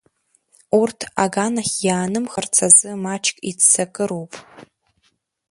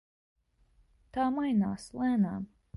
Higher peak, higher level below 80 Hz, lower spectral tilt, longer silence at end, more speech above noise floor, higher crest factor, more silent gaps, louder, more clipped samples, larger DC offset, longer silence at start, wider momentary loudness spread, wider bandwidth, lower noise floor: first, 0 dBFS vs -18 dBFS; about the same, -62 dBFS vs -62 dBFS; second, -2.5 dB/octave vs -7.5 dB/octave; first, 0.9 s vs 0.3 s; first, 47 dB vs 37 dB; first, 20 dB vs 14 dB; neither; first, -17 LUFS vs -31 LUFS; neither; neither; second, 0.7 s vs 1.15 s; first, 14 LU vs 9 LU; about the same, 11.5 kHz vs 11.5 kHz; about the same, -66 dBFS vs -67 dBFS